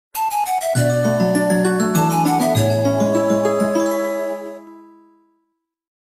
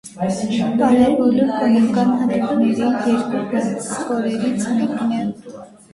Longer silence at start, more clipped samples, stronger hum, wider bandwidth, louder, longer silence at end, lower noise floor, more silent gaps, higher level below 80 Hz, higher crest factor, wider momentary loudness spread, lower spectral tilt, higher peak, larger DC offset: about the same, 0.15 s vs 0.05 s; neither; neither; first, 15.5 kHz vs 11.5 kHz; about the same, -18 LUFS vs -18 LUFS; first, 1.25 s vs 0.25 s; first, -72 dBFS vs -38 dBFS; neither; about the same, -54 dBFS vs -54 dBFS; about the same, 14 dB vs 16 dB; about the same, 7 LU vs 9 LU; about the same, -6 dB/octave vs -6 dB/octave; about the same, -4 dBFS vs -2 dBFS; neither